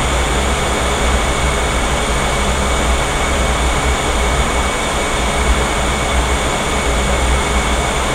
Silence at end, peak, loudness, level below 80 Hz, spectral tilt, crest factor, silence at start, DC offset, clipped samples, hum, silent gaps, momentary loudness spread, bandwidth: 0 s; -2 dBFS; -16 LUFS; -20 dBFS; -3.5 dB/octave; 14 dB; 0 s; under 0.1%; under 0.1%; none; none; 1 LU; 15.5 kHz